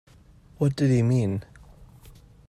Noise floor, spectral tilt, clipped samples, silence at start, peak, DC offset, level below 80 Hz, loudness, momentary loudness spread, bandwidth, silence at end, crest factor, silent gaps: -53 dBFS; -8 dB/octave; under 0.1%; 0.6 s; -10 dBFS; under 0.1%; -52 dBFS; -24 LUFS; 8 LU; 11 kHz; 1.1 s; 16 dB; none